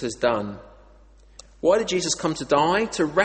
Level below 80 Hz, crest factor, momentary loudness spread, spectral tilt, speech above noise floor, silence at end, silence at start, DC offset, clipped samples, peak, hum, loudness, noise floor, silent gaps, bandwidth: -52 dBFS; 18 dB; 8 LU; -3.5 dB/octave; 29 dB; 0 s; 0 s; under 0.1%; under 0.1%; -6 dBFS; none; -22 LUFS; -51 dBFS; none; 8.8 kHz